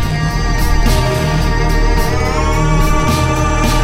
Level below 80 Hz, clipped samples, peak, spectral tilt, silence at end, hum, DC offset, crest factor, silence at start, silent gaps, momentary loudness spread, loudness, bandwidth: -16 dBFS; under 0.1%; 0 dBFS; -5.5 dB/octave; 0 s; none; under 0.1%; 12 dB; 0 s; none; 2 LU; -15 LUFS; 16.5 kHz